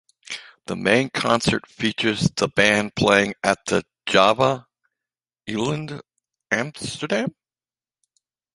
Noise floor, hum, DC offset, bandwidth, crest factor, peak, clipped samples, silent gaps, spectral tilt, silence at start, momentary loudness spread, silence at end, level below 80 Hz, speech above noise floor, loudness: under -90 dBFS; none; under 0.1%; 11.5 kHz; 22 dB; 0 dBFS; under 0.1%; none; -4 dB/octave; 0.3 s; 16 LU; 1.25 s; -52 dBFS; over 69 dB; -21 LUFS